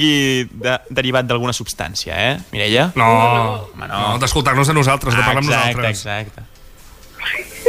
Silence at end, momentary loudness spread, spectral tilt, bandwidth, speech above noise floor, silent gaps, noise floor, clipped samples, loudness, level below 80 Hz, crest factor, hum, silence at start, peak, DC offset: 0 s; 10 LU; -4.5 dB/octave; 16 kHz; 24 dB; none; -40 dBFS; under 0.1%; -16 LUFS; -38 dBFS; 16 dB; none; 0 s; -2 dBFS; under 0.1%